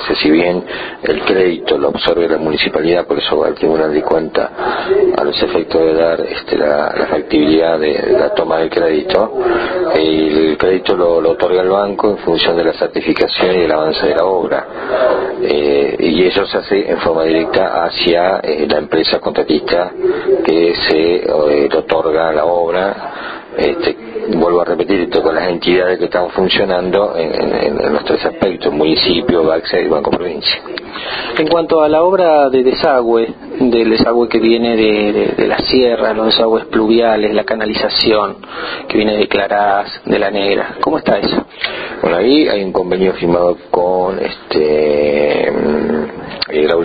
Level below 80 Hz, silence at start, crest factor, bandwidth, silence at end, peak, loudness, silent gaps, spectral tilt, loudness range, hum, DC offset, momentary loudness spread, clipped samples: -42 dBFS; 0 s; 12 dB; 5 kHz; 0 s; 0 dBFS; -13 LUFS; none; -7.5 dB/octave; 2 LU; none; under 0.1%; 6 LU; under 0.1%